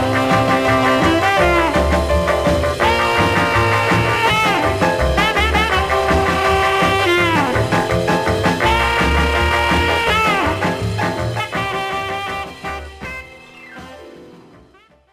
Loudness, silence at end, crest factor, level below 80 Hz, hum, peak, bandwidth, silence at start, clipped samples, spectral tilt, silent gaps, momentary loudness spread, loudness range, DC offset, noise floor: -15 LUFS; 0.8 s; 14 dB; -28 dBFS; none; -2 dBFS; 16 kHz; 0 s; under 0.1%; -5 dB/octave; none; 10 LU; 9 LU; 0.1%; -50 dBFS